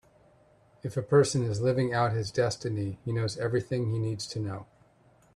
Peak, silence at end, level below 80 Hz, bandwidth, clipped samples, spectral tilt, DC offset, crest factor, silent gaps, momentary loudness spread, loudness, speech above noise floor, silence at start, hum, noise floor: -10 dBFS; 0.7 s; -62 dBFS; 11.5 kHz; under 0.1%; -6 dB/octave; under 0.1%; 18 dB; none; 11 LU; -29 LUFS; 34 dB; 0.85 s; none; -62 dBFS